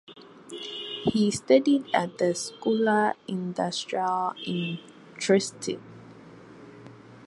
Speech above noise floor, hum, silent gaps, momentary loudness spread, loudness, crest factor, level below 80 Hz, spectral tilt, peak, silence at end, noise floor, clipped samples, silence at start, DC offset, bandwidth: 22 dB; none; none; 17 LU; -26 LUFS; 20 dB; -66 dBFS; -4.5 dB/octave; -8 dBFS; 0 s; -48 dBFS; under 0.1%; 0.1 s; under 0.1%; 11.5 kHz